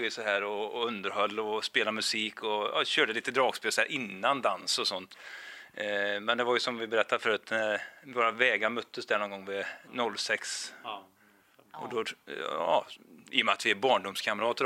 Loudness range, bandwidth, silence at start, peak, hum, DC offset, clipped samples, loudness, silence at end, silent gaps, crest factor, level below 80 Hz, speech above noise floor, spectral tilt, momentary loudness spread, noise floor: 6 LU; 16 kHz; 0 s; -8 dBFS; none; under 0.1%; under 0.1%; -30 LUFS; 0 s; none; 24 dB; -84 dBFS; 32 dB; -2 dB/octave; 11 LU; -63 dBFS